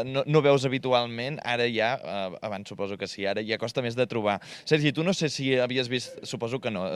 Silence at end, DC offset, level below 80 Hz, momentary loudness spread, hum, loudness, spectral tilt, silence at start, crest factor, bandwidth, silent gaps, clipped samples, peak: 0 s; under 0.1%; -68 dBFS; 10 LU; none; -27 LUFS; -5 dB/octave; 0 s; 20 dB; 12.5 kHz; none; under 0.1%; -6 dBFS